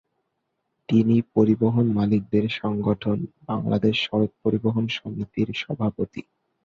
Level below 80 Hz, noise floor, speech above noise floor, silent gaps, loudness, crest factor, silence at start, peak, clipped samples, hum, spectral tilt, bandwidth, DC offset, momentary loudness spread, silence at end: -54 dBFS; -77 dBFS; 54 dB; none; -23 LUFS; 18 dB; 0.9 s; -6 dBFS; under 0.1%; none; -8 dB/octave; 6.8 kHz; under 0.1%; 10 LU; 0.45 s